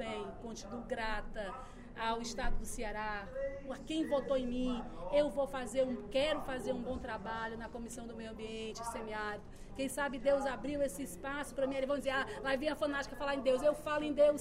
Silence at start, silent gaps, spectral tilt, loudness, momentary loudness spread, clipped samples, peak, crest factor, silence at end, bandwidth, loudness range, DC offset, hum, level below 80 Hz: 0 s; none; -4.5 dB/octave; -37 LUFS; 12 LU; under 0.1%; -18 dBFS; 18 dB; 0 s; 16 kHz; 5 LU; under 0.1%; none; -48 dBFS